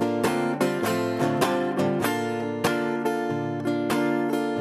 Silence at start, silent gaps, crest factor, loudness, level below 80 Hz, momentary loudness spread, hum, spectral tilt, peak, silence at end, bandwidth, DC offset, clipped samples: 0 s; none; 16 dB; -25 LUFS; -64 dBFS; 3 LU; none; -5.5 dB/octave; -8 dBFS; 0 s; 15.5 kHz; under 0.1%; under 0.1%